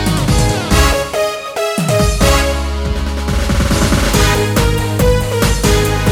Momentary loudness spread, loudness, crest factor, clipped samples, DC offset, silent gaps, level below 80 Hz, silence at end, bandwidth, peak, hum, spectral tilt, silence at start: 6 LU; -14 LUFS; 12 dB; under 0.1%; under 0.1%; none; -18 dBFS; 0 s; 19 kHz; 0 dBFS; none; -4.5 dB/octave; 0 s